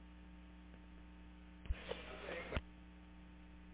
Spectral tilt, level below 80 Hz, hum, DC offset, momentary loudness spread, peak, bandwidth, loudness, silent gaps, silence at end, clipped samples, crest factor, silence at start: -4.5 dB/octave; -54 dBFS; none; under 0.1%; 13 LU; -22 dBFS; 4 kHz; -52 LUFS; none; 0 s; under 0.1%; 28 dB; 0 s